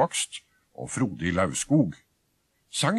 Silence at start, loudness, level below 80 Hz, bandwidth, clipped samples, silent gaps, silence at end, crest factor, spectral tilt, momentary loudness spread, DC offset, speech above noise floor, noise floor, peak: 0 s; -27 LUFS; -56 dBFS; 13 kHz; under 0.1%; none; 0 s; 18 dB; -4.5 dB/octave; 12 LU; under 0.1%; 45 dB; -71 dBFS; -8 dBFS